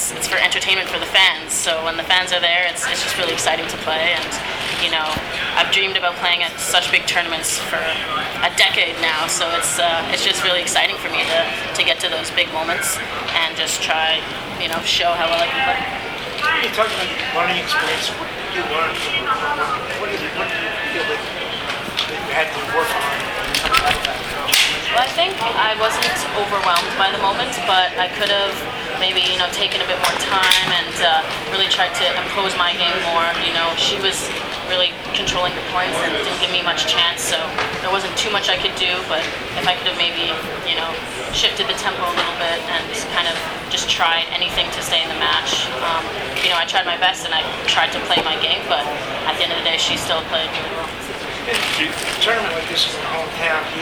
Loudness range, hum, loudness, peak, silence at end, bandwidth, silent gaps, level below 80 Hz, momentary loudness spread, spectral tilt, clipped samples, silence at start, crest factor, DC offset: 3 LU; none; -18 LUFS; 0 dBFS; 0 s; over 20 kHz; none; -46 dBFS; 6 LU; -1 dB/octave; under 0.1%; 0 s; 20 dB; under 0.1%